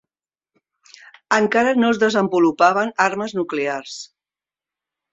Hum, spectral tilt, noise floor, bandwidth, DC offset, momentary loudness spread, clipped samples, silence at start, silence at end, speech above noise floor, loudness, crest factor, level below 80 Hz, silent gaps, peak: none; -4.5 dB/octave; under -90 dBFS; 8 kHz; under 0.1%; 13 LU; under 0.1%; 1.3 s; 1.1 s; over 72 dB; -18 LUFS; 18 dB; -64 dBFS; none; -2 dBFS